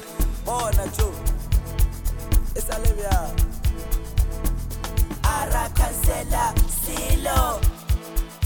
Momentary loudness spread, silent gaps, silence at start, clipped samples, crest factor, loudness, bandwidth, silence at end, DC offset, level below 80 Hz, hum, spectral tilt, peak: 7 LU; none; 0 s; under 0.1%; 16 dB; -25 LUFS; over 20 kHz; 0 s; 0.2%; -24 dBFS; none; -4.5 dB/octave; -6 dBFS